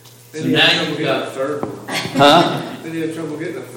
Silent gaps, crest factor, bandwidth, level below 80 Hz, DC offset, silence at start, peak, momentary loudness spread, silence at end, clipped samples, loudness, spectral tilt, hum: none; 18 dB; 17 kHz; -58 dBFS; under 0.1%; 0.05 s; 0 dBFS; 15 LU; 0 s; under 0.1%; -17 LUFS; -4.5 dB/octave; none